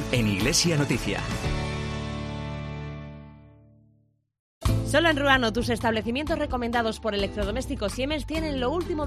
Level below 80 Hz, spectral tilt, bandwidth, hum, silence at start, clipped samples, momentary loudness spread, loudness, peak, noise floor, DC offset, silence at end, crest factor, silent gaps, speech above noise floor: -38 dBFS; -4.5 dB/octave; 14 kHz; none; 0 s; under 0.1%; 13 LU; -26 LUFS; -6 dBFS; -65 dBFS; under 0.1%; 0 s; 22 dB; 4.39-4.61 s; 40 dB